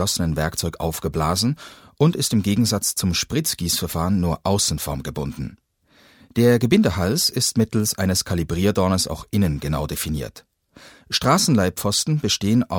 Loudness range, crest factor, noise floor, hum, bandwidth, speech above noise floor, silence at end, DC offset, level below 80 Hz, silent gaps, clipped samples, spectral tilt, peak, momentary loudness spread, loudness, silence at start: 3 LU; 18 dB; -55 dBFS; none; over 20 kHz; 35 dB; 0 s; under 0.1%; -40 dBFS; none; under 0.1%; -4.5 dB/octave; -4 dBFS; 9 LU; -21 LUFS; 0 s